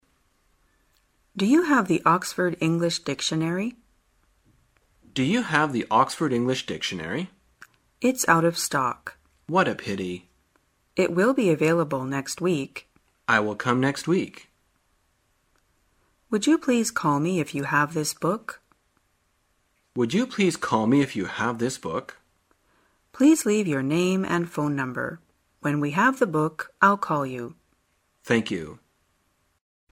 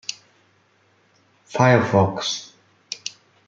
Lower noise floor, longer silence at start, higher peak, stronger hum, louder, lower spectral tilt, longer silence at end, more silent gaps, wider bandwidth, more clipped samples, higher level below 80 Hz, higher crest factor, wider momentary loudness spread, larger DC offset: first, -69 dBFS vs -61 dBFS; first, 1.35 s vs 0.1 s; about the same, -4 dBFS vs -2 dBFS; neither; second, -24 LUFS vs -21 LUFS; about the same, -5 dB/octave vs -5 dB/octave; first, 1.15 s vs 0.4 s; neither; first, 16 kHz vs 7.8 kHz; neither; about the same, -64 dBFS vs -64 dBFS; about the same, 22 dB vs 22 dB; second, 13 LU vs 17 LU; neither